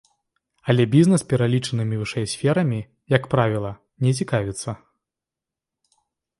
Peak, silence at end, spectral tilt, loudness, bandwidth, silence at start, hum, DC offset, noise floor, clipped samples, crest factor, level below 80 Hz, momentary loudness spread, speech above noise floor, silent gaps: -2 dBFS; 1.65 s; -6.5 dB/octave; -21 LUFS; 11.5 kHz; 0.65 s; none; under 0.1%; -88 dBFS; under 0.1%; 22 dB; -54 dBFS; 14 LU; 67 dB; none